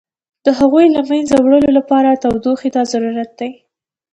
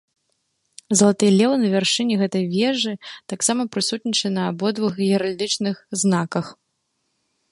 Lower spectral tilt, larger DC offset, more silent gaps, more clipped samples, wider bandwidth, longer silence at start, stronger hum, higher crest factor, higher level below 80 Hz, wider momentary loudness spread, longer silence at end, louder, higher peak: first, -5.5 dB/octave vs -4 dB/octave; neither; neither; neither; second, 9.6 kHz vs 11.5 kHz; second, 0.45 s vs 0.9 s; neither; about the same, 14 dB vs 18 dB; first, -48 dBFS vs -66 dBFS; about the same, 11 LU vs 9 LU; second, 0.6 s vs 1 s; first, -13 LUFS vs -20 LUFS; about the same, 0 dBFS vs -2 dBFS